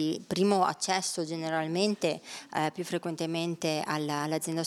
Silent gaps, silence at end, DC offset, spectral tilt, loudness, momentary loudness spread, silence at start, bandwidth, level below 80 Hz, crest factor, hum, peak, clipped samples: none; 0 s; under 0.1%; -4 dB/octave; -30 LUFS; 6 LU; 0 s; 16 kHz; -76 dBFS; 20 dB; none; -10 dBFS; under 0.1%